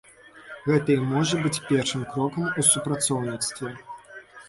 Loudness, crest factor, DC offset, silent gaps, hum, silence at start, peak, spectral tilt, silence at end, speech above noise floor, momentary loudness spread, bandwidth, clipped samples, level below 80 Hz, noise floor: -24 LUFS; 20 dB; under 0.1%; none; none; 0.35 s; -6 dBFS; -4 dB/octave; 0 s; 21 dB; 22 LU; 12 kHz; under 0.1%; -60 dBFS; -46 dBFS